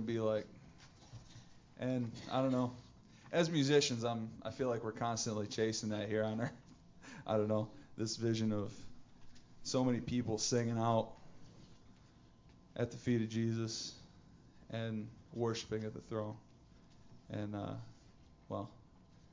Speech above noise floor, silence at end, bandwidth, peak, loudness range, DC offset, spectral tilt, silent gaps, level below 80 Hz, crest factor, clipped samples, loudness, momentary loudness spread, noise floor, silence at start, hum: 26 dB; 0.55 s; 7.6 kHz; -18 dBFS; 8 LU; under 0.1%; -5 dB/octave; none; -66 dBFS; 22 dB; under 0.1%; -38 LUFS; 20 LU; -63 dBFS; 0 s; none